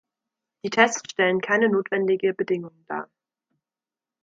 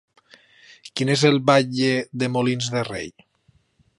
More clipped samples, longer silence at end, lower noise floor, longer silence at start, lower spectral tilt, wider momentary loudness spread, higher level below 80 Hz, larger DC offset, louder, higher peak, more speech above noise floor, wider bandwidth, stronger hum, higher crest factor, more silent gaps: neither; first, 1.2 s vs 0.9 s; first, under -90 dBFS vs -62 dBFS; second, 0.65 s vs 0.85 s; about the same, -4 dB/octave vs -5 dB/octave; about the same, 14 LU vs 14 LU; second, -72 dBFS vs -60 dBFS; neither; about the same, -22 LUFS vs -21 LUFS; about the same, -4 dBFS vs -4 dBFS; first, over 67 dB vs 41 dB; second, 7.8 kHz vs 11.5 kHz; neither; about the same, 22 dB vs 20 dB; neither